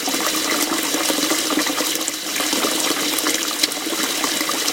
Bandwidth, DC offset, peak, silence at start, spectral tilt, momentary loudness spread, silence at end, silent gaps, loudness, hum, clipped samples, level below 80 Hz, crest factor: 17.5 kHz; under 0.1%; 0 dBFS; 0 s; 0 dB/octave; 2 LU; 0 s; none; -19 LUFS; none; under 0.1%; -62 dBFS; 20 dB